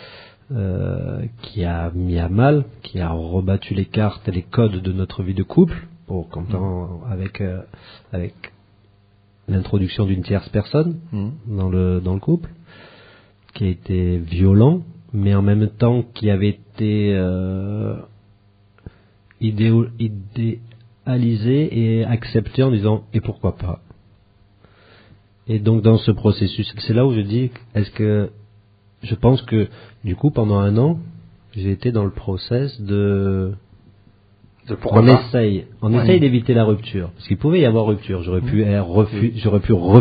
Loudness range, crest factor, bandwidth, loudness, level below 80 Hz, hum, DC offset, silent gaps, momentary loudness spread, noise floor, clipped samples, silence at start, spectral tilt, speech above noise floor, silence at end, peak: 6 LU; 18 dB; 5 kHz; -19 LUFS; -40 dBFS; none; under 0.1%; none; 13 LU; -54 dBFS; under 0.1%; 0 s; -8 dB/octave; 37 dB; 0 s; 0 dBFS